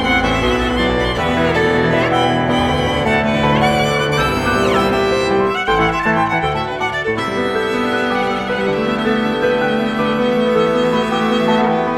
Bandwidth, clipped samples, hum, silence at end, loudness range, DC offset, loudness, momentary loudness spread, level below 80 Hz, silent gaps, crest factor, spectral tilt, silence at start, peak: 16 kHz; under 0.1%; none; 0 s; 2 LU; under 0.1%; -16 LUFS; 4 LU; -34 dBFS; none; 14 dB; -5.5 dB/octave; 0 s; -2 dBFS